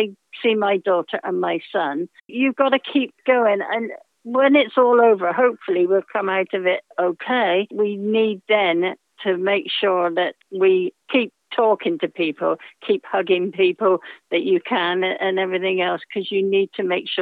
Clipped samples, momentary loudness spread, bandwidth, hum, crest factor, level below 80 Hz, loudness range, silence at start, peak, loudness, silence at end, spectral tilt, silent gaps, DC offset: under 0.1%; 8 LU; 4.6 kHz; none; 16 dB; -86 dBFS; 3 LU; 0 s; -4 dBFS; -20 LUFS; 0 s; -7.5 dB/octave; none; under 0.1%